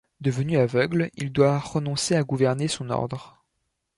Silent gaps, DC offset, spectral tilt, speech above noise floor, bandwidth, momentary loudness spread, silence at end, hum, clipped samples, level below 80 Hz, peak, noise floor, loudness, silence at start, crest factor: none; under 0.1%; -5.5 dB/octave; 53 dB; 11.5 kHz; 7 LU; 0.7 s; none; under 0.1%; -56 dBFS; -6 dBFS; -77 dBFS; -24 LUFS; 0.2 s; 18 dB